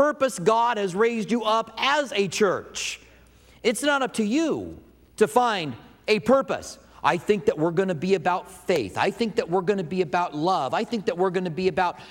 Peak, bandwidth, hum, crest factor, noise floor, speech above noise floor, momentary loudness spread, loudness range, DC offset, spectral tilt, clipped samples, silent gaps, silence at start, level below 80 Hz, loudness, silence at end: -4 dBFS; 16.5 kHz; none; 20 dB; -53 dBFS; 29 dB; 8 LU; 2 LU; under 0.1%; -4.5 dB/octave; under 0.1%; none; 0 s; -60 dBFS; -24 LUFS; 0 s